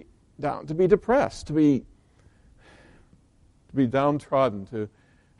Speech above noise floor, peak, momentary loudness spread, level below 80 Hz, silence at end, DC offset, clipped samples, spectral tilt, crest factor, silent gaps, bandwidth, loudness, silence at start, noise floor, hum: 36 dB; -4 dBFS; 12 LU; -52 dBFS; 0.5 s; under 0.1%; under 0.1%; -7.5 dB/octave; 22 dB; none; 11 kHz; -24 LUFS; 0.4 s; -59 dBFS; none